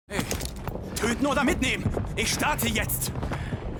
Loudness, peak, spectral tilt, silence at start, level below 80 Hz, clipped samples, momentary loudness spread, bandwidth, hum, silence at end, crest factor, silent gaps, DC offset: -27 LUFS; -8 dBFS; -4 dB/octave; 0.1 s; -38 dBFS; under 0.1%; 8 LU; over 20 kHz; none; 0 s; 20 dB; none; under 0.1%